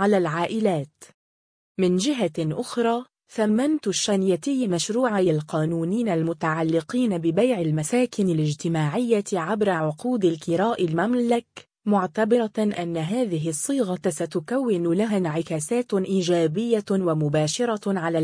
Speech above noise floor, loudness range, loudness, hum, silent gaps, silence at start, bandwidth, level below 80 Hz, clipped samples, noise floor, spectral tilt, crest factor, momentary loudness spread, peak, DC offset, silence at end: over 67 dB; 2 LU; -23 LUFS; none; 1.14-1.75 s; 0 s; 10.5 kHz; -66 dBFS; under 0.1%; under -90 dBFS; -5.5 dB/octave; 14 dB; 4 LU; -8 dBFS; under 0.1%; 0 s